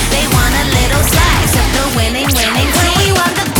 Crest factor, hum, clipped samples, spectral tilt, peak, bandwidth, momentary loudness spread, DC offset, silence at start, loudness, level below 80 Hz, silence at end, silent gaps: 12 dB; none; under 0.1%; -3.5 dB/octave; 0 dBFS; over 20 kHz; 3 LU; under 0.1%; 0 s; -11 LUFS; -18 dBFS; 0 s; none